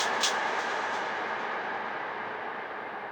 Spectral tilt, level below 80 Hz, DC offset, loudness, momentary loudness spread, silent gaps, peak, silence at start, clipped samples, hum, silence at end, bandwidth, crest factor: -1 dB/octave; -78 dBFS; under 0.1%; -31 LUFS; 10 LU; none; -12 dBFS; 0 s; under 0.1%; none; 0 s; over 20 kHz; 20 dB